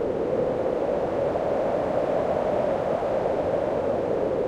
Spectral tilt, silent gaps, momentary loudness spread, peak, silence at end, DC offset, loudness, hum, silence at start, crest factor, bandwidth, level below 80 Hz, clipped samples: -7.5 dB/octave; none; 1 LU; -12 dBFS; 0 s; under 0.1%; -25 LUFS; none; 0 s; 14 dB; 10 kHz; -50 dBFS; under 0.1%